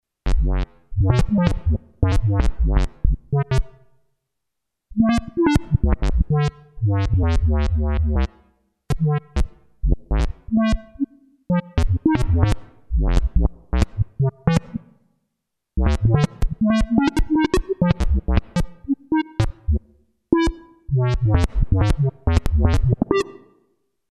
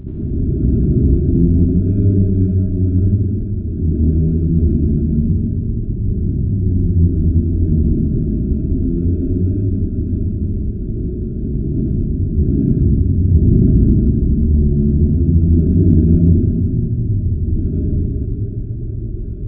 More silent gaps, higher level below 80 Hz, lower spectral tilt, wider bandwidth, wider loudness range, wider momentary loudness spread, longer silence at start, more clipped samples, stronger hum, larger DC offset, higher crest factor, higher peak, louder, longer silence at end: neither; second, -24 dBFS vs -18 dBFS; second, -7.5 dB/octave vs -16 dB/octave; first, 12 kHz vs 1.4 kHz; second, 3 LU vs 6 LU; about the same, 8 LU vs 9 LU; first, 0.25 s vs 0 s; neither; neither; second, under 0.1% vs 0.2%; about the same, 16 dB vs 14 dB; second, -4 dBFS vs 0 dBFS; second, -22 LUFS vs -16 LUFS; first, 0.8 s vs 0 s